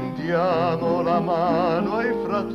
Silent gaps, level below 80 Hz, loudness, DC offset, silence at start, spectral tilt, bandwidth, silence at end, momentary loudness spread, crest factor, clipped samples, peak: none; -52 dBFS; -22 LUFS; under 0.1%; 0 s; -8 dB/octave; 13 kHz; 0 s; 3 LU; 14 dB; under 0.1%; -8 dBFS